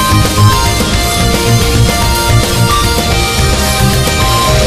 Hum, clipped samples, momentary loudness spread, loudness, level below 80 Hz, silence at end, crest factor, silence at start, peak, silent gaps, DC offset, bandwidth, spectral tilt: none; 0.2%; 2 LU; -10 LUFS; -16 dBFS; 0 s; 10 dB; 0 s; 0 dBFS; none; under 0.1%; 16 kHz; -4 dB/octave